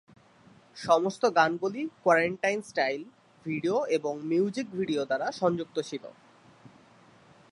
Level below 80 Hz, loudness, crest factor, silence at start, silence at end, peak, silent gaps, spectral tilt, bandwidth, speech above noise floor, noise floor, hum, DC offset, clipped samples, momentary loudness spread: -74 dBFS; -28 LUFS; 22 dB; 0.75 s; 0.85 s; -8 dBFS; none; -5 dB/octave; 11.5 kHz; 30 dB; -58 dBFS; none; under 0.1%; under 0.1%; 13 LU